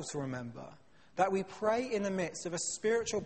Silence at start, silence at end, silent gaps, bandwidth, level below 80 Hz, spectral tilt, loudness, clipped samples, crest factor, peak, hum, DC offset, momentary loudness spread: 0 s; 0 s; none; 8.8 kHz; -68 dBFS; -4 dB/octave; -34 LUFS; under 0.1%; 18 dB; -16 dBFS; none; under 0.1%; 14 LU